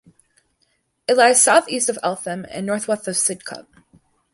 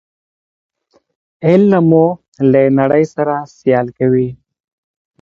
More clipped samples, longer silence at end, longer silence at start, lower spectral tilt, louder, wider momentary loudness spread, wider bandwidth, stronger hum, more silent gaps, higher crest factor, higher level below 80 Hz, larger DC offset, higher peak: neither; about the same, 0.75 s vs 0.85 s; second, 1.1 s vs 1.4 s; second, -2 dB/octave vs -9.5 dB/octave; second, -18 LUFS vs -13 LUFS; first, 18 LU vs 8 LU; first, 12 kHz vs 7.4 kHz; neither; second, none vs 2.28-2.32 s; first, 20 dB vs 14 dB; second, -66 dBFS vs -54 dBFS; neither; about the same, -2 dBFS vs 0 dBFS